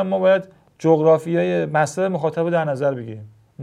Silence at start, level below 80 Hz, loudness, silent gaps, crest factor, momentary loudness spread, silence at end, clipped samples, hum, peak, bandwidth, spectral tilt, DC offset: 0 s; -66 dBFS; -19 LUFS; none; 16 dB; 8 LU; 0 s; under 0.1%; none; -2 dBFS; 12 kHz; -7 dB/octave; under 0.1%